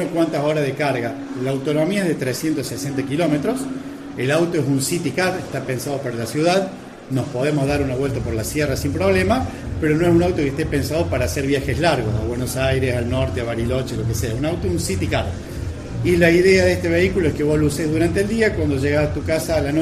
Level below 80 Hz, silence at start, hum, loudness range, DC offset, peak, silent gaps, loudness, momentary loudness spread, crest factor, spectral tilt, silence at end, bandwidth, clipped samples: -38 dBFS; 0 s; none; 4 LU; under 0.1%; -2 dBFS; none; -20 LUFS; 8 LU; 18 dB; -6 dB/octave; 0 s; 14.5 kHz; under 0.1%